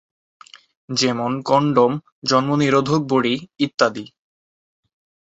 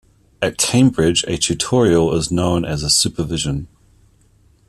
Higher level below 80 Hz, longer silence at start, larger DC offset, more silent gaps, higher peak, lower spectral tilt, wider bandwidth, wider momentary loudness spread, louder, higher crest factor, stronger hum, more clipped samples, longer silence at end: second, -60 dBFS vs -40 dBFS; first, 0.9 s vs 0.4 s; neither; first, 2.12-2.22 s, 3.74-3.78 s vs none; about the same, -2 dBFS vs -2 dBFS; about the same, -5 dB/octave vs -4 dB/octave; second, 8.2 kHz vs 14 kHz; about the same, 7 LU vs 8 LU; about the same, -19 LUFS vs -17 LUFS; about the same, 18 dB vs 16 dB; neither; neither; first, 1.2 s vs 1 s